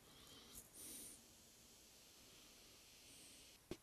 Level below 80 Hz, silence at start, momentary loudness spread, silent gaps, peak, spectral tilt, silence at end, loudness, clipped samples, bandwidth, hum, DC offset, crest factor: -76 dBFS; 0 s; 10 LU; none; -34 dBFS; -2 dB/octave; 0 s; -59 LUFS; under 0.1%; 15 kHz; none; under 0.1%; 26 dB